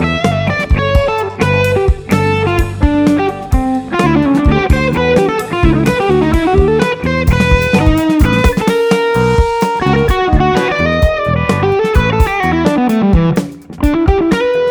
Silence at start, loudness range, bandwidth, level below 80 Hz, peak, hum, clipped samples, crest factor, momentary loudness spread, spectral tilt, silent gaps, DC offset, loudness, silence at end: 0 s; 1 LU; over 20 kHz; -18 dBFS; 0 dBFS; none; under 0.1%; 12 dB; 4 LU; -6.5 dB/octave; none; under 0.1%; -12 LUFS; 0 s